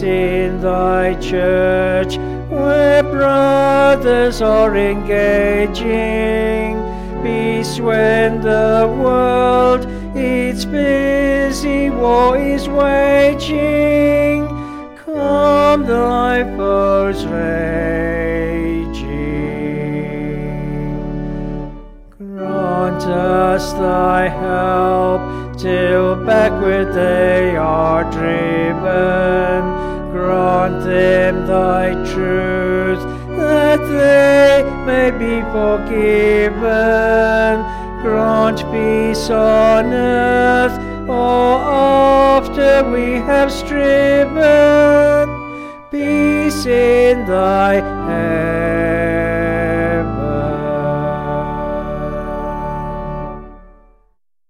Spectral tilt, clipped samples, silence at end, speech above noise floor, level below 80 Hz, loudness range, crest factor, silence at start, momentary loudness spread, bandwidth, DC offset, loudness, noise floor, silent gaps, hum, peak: -6.5 dB/octave; under 0.1%; 0.9 s; 47 dB; -30 dBFS; 7 LU; 12 dB; 0 s; 11 LU; 15 kHz; under 0.1%; -14 LUFS; -60 dBFS; none; none; -2 dBFS